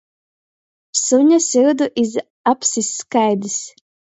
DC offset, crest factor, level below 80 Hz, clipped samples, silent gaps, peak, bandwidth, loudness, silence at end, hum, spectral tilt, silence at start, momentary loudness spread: under 0.1%; 16 dB; -70 dBFS; under 0.1%; 2.30-2.44 s; -2 dBFS; 8.2 kHz; -17 LUFS; 0.45 s; none; -3 dB/octave; 0.95 s; 9 LU